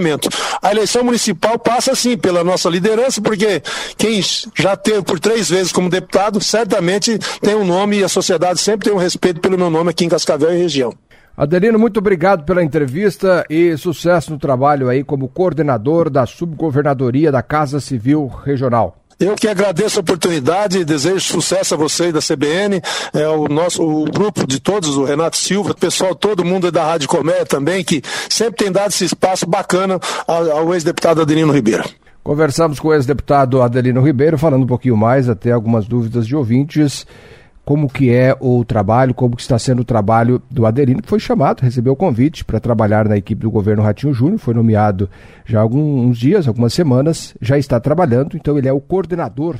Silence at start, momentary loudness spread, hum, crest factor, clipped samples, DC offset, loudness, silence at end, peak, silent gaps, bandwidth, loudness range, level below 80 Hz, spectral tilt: 0 s; 4 LU; none; 14 dB; under 0.1%; under 0.1%; -15 LUFS; 0 s; 0 dBFS; none; 16 kHz; 2 LU; -42 dBFS; -5.5 dB/octave